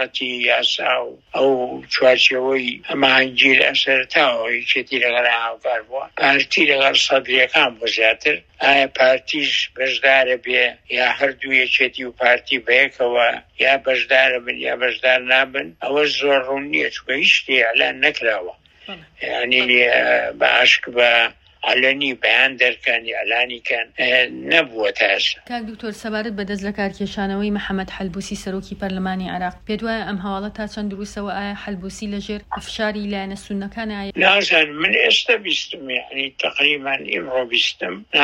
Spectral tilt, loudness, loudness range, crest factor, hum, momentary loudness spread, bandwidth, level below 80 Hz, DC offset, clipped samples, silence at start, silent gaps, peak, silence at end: -3 dB/octave; -17 LUFS; 10 LU; 18 dB; none; 13 LU; 11.5 kHz; -50 dBFS; under 0.1%; under 0.1%; 0 s; none; 0 dBFS; 0 s